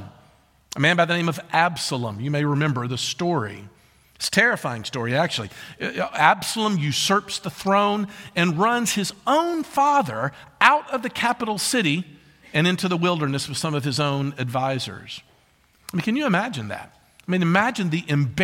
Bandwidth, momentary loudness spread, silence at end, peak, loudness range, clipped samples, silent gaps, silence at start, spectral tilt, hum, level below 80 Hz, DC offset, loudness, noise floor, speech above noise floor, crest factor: 16.5 kHz; 11 LU; 0 s; 0 dBFS; 4 LU; under 0.1%; none; 0 s; -4.5 dB/octave; none; -62 dBFS; under 0.1%; -22 LUFS; -59 dBFS; 37 dB; 22 dB